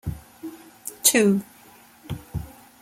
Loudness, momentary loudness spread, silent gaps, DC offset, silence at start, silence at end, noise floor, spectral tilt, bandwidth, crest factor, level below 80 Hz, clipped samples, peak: -20 LUFS; 23 LU; none; under 0.1%; 0.05 s; 0.3 s; -51 dBFS; -3.5 dB/octave; 16.5 kHz; 24 dB; -46 dBFS; under 0.1%; -2 dBFS